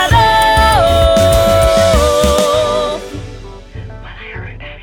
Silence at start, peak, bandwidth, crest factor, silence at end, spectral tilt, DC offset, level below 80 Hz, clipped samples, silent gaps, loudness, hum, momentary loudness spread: 0 s; 0 dBFS; 19 kHz; 12 dB; 0 s; -4.5 dB/octave; under 0.1%; -22 dBFS; under 0.1%; none; -10 LUFS; none; 21 LU